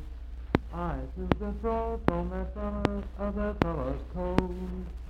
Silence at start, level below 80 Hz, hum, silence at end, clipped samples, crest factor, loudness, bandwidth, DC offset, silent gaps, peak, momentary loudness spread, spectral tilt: 0 s; -36 dBFS; none; 0 s; under 0.1%; 28 dB; -32 LUFS; 8.6 kHz; under 0.1%; none; -4 dBFS; 6 LU; -8.5 dB/octave